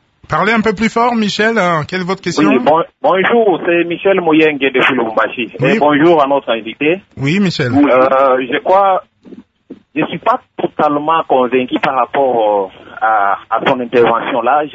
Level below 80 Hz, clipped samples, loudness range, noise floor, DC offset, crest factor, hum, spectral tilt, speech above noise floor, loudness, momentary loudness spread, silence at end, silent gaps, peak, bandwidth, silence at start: -50 dBFS; under 0.1%; 3 LU; -38 dBFS; under 0.1%; 12 dB; none; -6 dB/octave; 26 dB; -13 LUFS; 7 LU; 0 s; none; 0 dBFS; 8 kHz; 0.3 s